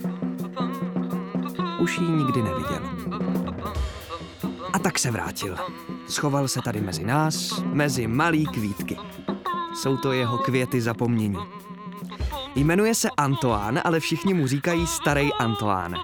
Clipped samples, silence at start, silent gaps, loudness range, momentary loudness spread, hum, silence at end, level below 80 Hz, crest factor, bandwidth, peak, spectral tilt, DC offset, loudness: under 0.1%; 0 s; none; 4 LU; 10 LU; none; 0 s; -42 dBFS; 18 dB; over 20 kHz; -6 dBFS; -5 dB/octave; under 0.1%; -25 LUFS